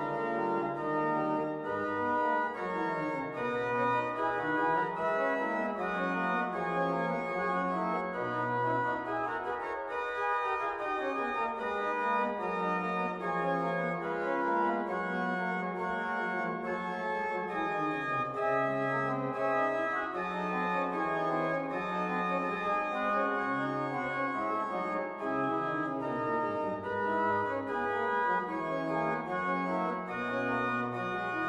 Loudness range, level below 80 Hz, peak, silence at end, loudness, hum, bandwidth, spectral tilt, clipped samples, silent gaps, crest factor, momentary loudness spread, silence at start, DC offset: 1 LU; -68 dBFS; -18 dBFS; 0 s; -32 LUFS; none; 11.5 kHz; -7 dB/octave; under 0.1%; none; 14 dB; 4 LU; 0 s; under 0.1%